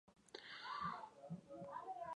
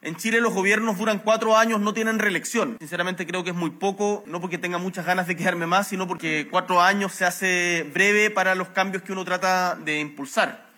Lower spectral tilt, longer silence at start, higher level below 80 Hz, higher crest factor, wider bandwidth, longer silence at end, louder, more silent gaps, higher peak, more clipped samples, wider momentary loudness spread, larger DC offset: about the same, -5 dB/octave vs -4 dB/octave; about the same, 0.05 s vs 0.05 s; about the same, -80 dBFS vs -82 dBFS; about the same, 18 dB vs 18 dB; second, 11 kHz vs 17.5 kHz; second, 0 s vs 0.15 s; second, -51 LUFS vs -23 LUFS; neither; second, -34 dBFS vs -6 dBFS; neither; about the same, 9 LU vs 9 LU; neither